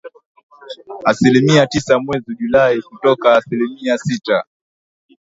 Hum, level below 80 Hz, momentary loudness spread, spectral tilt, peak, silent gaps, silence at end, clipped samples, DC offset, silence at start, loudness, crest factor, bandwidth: none; -52 dBFS; 11 LU; -5.5 dB/octave; 0 dBFS; 0.26-0.35 s, 0.43-0.50 s; 0.8 s; under 0.1%; under 0.1%; 0.05 s; -15 LUFS; 16 dB; 8 kHz